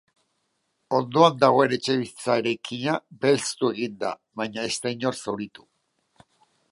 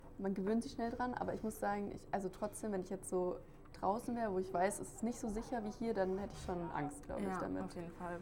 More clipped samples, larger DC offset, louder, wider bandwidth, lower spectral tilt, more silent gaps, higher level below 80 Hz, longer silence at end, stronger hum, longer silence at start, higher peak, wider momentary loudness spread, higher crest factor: neither; neither; first, -24 LUFS vs -41 LUFS; second, 11.5 kHz vs 18 kHz; second, -4.5 dB/octave vs -6 dB/octave; neither; second, -70 dBFS vs -58 dBFS; first, 1.25 s vs 0 s; neither; first, 0.9 s vs 0 s; first, -2 dBFS vs -22 dBFS; first, 13 LU vs 6 LU; about the same, 22 dB vs 18 dB